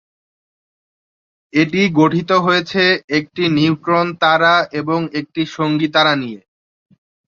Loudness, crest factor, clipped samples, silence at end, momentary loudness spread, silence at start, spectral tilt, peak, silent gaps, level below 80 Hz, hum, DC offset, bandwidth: -15 LUFS; 16 dB; under 0.1%; 0.95 s; 7 LU; 1.55 s; -6 dB/octave; 0 dBFS; 3.04-3.08 s; -60 dBFS; none; under 0.1%; 7.4 kHz